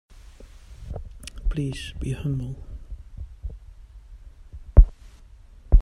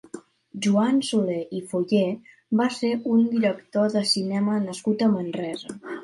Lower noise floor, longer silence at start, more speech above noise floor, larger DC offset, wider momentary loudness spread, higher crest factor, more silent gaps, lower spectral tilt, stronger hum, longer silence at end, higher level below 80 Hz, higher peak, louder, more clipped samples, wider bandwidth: first, -47 dBFS vs -43 dBFS; first, 0.4 s vs 0.15 s; about the same, 19 dB vs 20 dB; neither; first, 27 LU vs 12 LU; first, 24 dB vs 16 dB; neither; first, -7 dB/octave vs -5.5 dB/octave; neither; about the same, 0 s vs 0 s; first, -24 dBFS vs -70 dBFS; first, 0 dBFS vs -8 dBFS; about the same, -26 LUFS vs -24 LUFS; neither; about the same, 10.5 kHz vs 11.5 kHz